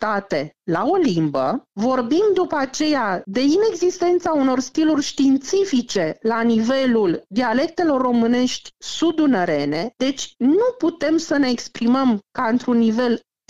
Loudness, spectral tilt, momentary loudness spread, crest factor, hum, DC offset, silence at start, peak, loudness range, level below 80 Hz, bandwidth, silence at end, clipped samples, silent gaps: -19 LUFS; -5 dB/octave; 5 LU; 10 dB; none; 0.4%; 0 s; -8 dBFS; 1 LU; -60 dBFS; 7.8 kHz; 0.3 s; under 0.1%; none